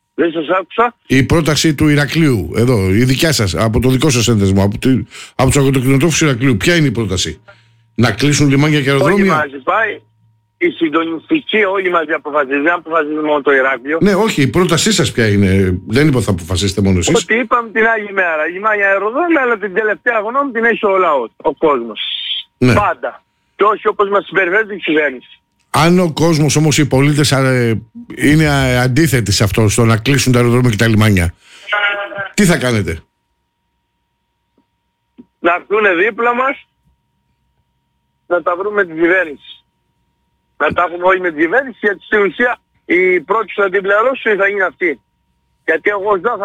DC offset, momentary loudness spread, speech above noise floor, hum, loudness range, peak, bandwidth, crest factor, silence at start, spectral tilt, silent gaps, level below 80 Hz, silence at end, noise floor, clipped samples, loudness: under 0.1%; 6 LU; 54 dB; none; 5 LU; -2 dBFS; 17 kHz; 12 dB; 0.2 s; -5 dB/octave; none; -38 dBFS; 0 s; -67 dBFS; under 0.1%; -13 LUFS